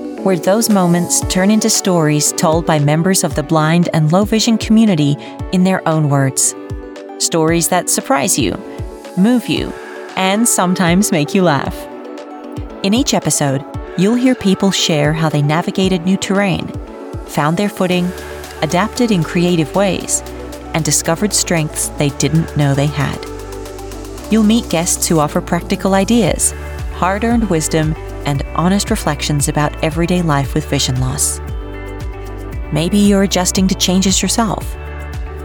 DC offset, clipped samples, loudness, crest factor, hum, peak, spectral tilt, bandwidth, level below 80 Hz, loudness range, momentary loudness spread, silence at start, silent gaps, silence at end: under 0.1%; under 0.1%; -14 LUFS; 14 dB; none; -2 dBFS; -4.5 dB/octave; over 20 kHz; -30 dBFS; 4 LU; 15 LU; 0 s; none; 0 s